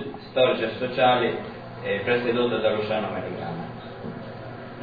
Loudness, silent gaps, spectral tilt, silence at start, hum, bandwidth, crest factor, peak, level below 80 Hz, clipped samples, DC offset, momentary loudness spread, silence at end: -24 LUFS; none; -8 dB/octave; 0 s; none; 5 kHz; 18 dB; -8 dBFS; -58 dBFS; under 0.1%; 0.1%; 16 LU; 0 s